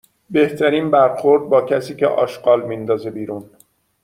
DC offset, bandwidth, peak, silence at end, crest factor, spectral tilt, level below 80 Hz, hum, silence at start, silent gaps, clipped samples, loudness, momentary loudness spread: under 0.1%; 15 kHz; -2 dBFS; 0.6 s; 16 dB; -6.5 dB/octave; -62 dBFS; none; 0.3 s; none; under 0.1%; -17 LUFS; 11 LU